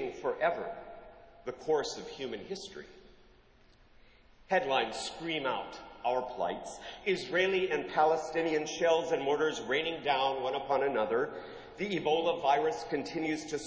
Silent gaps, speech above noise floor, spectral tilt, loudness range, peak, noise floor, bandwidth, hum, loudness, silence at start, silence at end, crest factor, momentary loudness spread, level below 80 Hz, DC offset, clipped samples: none; 29 dB; -4 dB/octave; 8 LU; -16 dBFS; -61 dBFS; 8 kHz; none; -32 LUFS; 0 s; 0 s; 18 dB; 13 LU; -66 dBFS; under 0.1%; under 0.1%